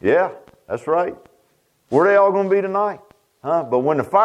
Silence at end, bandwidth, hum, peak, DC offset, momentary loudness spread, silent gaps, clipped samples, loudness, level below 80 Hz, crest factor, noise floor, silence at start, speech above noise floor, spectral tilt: 0 s; 11 kHz; none; -2 dBFS; under 0.1%; 14 LU; none; under 0.1%; -19 LUFS; -64 dBFS; 16 dB; -62 dBFS; 0.05 s; 45 dB; -7.5 dB/octave